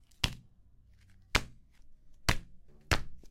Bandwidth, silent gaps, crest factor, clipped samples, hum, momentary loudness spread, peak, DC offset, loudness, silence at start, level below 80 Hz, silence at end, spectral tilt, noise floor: 16.5 kHz; none; 32 dB; under 0.1%; none; 10 LU; -4 dBFS; under 0.1%; -34 LUFS; 0.2 s; -44 dBFS; 0 s; -3 dB/octave; -60 dBFS